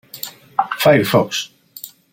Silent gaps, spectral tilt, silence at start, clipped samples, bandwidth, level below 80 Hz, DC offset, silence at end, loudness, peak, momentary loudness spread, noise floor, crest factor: none; -4.5 dB/octave; 0.15 s; under 0.1%; 16.5 kHz; -58 dBFS; under 0.1%; 0.25 s; -16 LUFS; -2 dBFS; 21 LU; -39 dBFS; 18 dB